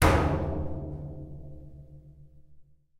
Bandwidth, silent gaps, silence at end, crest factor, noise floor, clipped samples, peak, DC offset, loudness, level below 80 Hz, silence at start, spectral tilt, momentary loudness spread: 16 kHz; none; 0.4 s; 24 dB; -54 dBFS; under 0.1%; -6 dBFS; under 0.1%; -31 LUFS; -38 dBFS; 0 s; -6 dB/octave; 25 LU